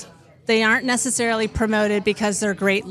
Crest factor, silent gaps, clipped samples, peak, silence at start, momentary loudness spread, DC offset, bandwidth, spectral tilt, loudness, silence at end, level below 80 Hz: 16 dB; none; under 0.1%; -6 dBFS; 0 s; 4 LU; under 0.1%; 14 kHz; -3.5 dB/octave; -20 LUFS; 0 s; -44 dBFS